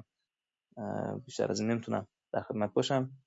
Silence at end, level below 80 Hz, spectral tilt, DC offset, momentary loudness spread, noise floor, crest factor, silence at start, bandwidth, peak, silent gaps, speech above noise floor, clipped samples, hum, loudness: 0.1 s; -76 dBFS; -5.5 dB/octave; under 0.1%; 9 LU; under -90 dBFS; 20 dB; 0.75 s; 7.6 kHz; -14 dBFS; none; over 57 dB; under 0.1%; none; -34 LUFS